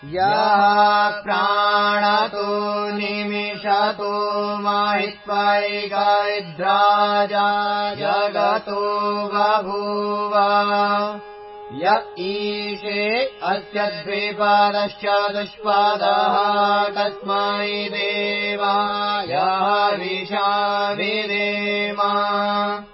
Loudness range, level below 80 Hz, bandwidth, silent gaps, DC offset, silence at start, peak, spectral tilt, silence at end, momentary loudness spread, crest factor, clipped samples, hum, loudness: 2 LU; -62 dBFS; 5.8 kHz; none; under 0.1%; 0 s; -4 dBFS; -8 dB/octave; 0.05 s; 7 LU; 16 dB; under 0.1%; none; -20 LUFS